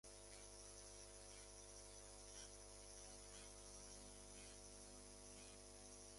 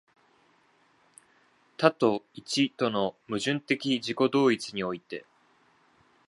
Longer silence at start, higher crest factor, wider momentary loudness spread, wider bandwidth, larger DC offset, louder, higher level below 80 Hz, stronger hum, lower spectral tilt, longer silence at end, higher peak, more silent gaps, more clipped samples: second, 0.05 s vs 1.8 s; second, 18 dB vs 24 dB; second, 2 LU vs 12 LU; about the same, 11.5 kHz vs 11.5 kHz; neither; second, -58 LUFS vs -28 LUFS; about the same, -68 dBFS vs -72 dBFS; first, 50 Hz at -65 dBFS vs none; second, -2 dB/octave vs -4.5 dB/octave; second, 0 s vs 1.05 s; second, -42 dBFS vs -6 dBFS; neither; neither